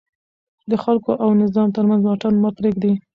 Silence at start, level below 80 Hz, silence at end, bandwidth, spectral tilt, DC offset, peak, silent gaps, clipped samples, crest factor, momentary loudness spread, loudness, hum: 0.65 s; -58 dBFS; 0.15 s; 5.2 kHz; -10 dB/octave; under 0.1%; -6 dBFS; none; under 0.1%; 12 dB; 4 LU; -18 LUFS; none